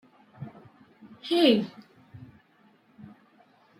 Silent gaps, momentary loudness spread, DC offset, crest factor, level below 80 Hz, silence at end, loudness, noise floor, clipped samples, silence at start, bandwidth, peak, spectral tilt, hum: none; 29 LU; under 0.1%; 22 dB; -74 dBFS; 1.65 s; -24 LUFS; -62 dBFS; under 0.1%; 0.4 s; 16 kHz; -10 dBFS; -6 dB/octave; none